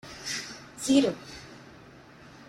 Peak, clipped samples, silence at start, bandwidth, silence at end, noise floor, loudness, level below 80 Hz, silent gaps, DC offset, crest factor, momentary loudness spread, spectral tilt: -10 dBFS; under 0.1%; 0.05 s; 15 kHz; 0.8 s; -51 dBFS; -27 LUFS; -62 dBFS; none; under 0.1%; 20 dB; 25 LU; -3.5 dB/octave